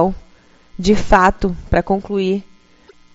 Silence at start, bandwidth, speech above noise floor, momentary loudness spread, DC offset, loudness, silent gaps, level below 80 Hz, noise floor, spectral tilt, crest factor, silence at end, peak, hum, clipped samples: 0 s; 8 kHz; 33 dB; 12 LU; under 0.1%; -17 LUFS; none; -30 dBFS; -48 dBFS; -5 dB/octave; 18 dB; 0.75 s; 0 dBFS; none; under 0.1%